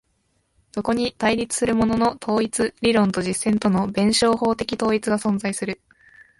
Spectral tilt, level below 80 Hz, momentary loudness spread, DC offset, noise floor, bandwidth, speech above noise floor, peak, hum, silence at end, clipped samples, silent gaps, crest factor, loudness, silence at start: -4.5 dB/octave; -50 dBFS; 7 LU; under 0.1%; -68 dBFS; 11.5 kHz; 47 dB; -6 dBFS; none; 0.65 s; under 0.1%; none; 16 dB; -21 LUFS; 0.75 s